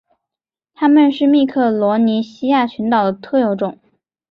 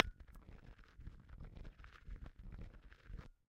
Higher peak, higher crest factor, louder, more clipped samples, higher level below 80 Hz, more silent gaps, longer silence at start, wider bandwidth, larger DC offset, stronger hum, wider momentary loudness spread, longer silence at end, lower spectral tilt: first, -2 dBFS vs -8 dBFS; second, 14 dB vs 42 dB; first, -15 LUFS vs -53 LUFS; neither; second, -62 dBFS vs -54 dBFS; neither; first, 0.8 s vs 0 s; second, 6 kHz vs 11.5 kHz; neither; neither; about the same, 7 LU vs 5 LU; first, 0.55 s vs 0.15 s; first, -8 dB/octave vs -6.5 dB/octave